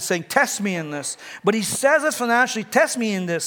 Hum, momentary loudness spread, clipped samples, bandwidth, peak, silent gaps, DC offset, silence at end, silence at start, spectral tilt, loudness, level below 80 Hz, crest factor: none; 8 LU; under 0.1%; 19.5 kHz; -4 dBFS; none; under 0.1%; 0 s; 0 s; -3.5 dB/octave; -21 LUFS; -70 dBFS; 18 dB